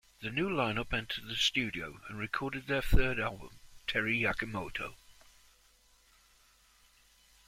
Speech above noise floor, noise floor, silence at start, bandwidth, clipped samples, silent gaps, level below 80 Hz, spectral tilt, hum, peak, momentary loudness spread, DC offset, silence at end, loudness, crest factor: 33 dB; -66 dBFS; 0.2 s; 16 kHz; under 0.1%; none; -42 dBFS; -4.5 dB/octave; none; -12 dBFS; 12 LU; under 0.1%; 2.35 s; -34 LUFS; 22 dB